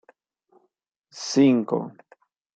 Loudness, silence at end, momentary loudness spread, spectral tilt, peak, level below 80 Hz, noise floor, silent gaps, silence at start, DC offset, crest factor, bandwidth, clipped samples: -22 LUFS; 0.65 s; 17 LU; -5.5 dB/octave; -8 dBFS; -76 dBFS; -72 dBFS; none; 1.15 s; under 0.1%; 18 dB; 8.2 kHz; under 0.1%